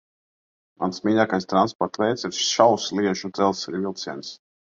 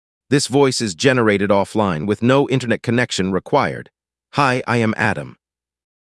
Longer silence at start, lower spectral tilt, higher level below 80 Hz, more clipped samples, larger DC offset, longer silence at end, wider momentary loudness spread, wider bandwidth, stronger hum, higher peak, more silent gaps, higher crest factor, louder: first, 0.8 s vs 0.3 s; about the same, -4 dB/octave vs -5 dB/octave; second, -62 dBFS vs -56 dBFS; neither; neither; second, 0.4 s vs 0.7 s; first, 12 LU vs 5 LU; second, 7.8 kHz vs 12 kHz; neither; about the same, 0 dBFS vs 0 dBFS; first, 1.75-1.79 s vs none; first, 24 dB vs 18 dB; second, -23 LUFS vs -18 LUFS